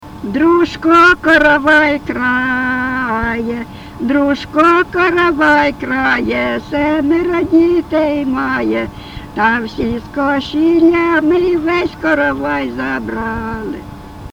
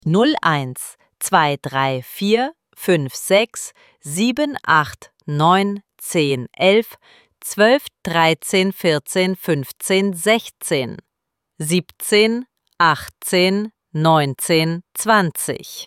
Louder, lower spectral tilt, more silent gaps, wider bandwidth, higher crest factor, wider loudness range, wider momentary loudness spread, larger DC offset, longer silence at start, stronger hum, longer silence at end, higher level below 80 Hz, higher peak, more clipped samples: first, -13 LUFS vs -18 LUFS; first, -6 dB/octave vs -4.5 dB/octave; neither; second, 9.8 kHz vs 17 kHz; about the same, 14 dB vs 18 dB; about the same, 4 LU vs 2 LU; about the same, 12 LU vs 12 LU; neither; about the same, 0 s vs 0.05 s; neither; about the same, 0.05 s vs 0 s; first, -38 dBFS vs -60 dBFS; about the same, 0 dBFS vs -2 dBFS; neither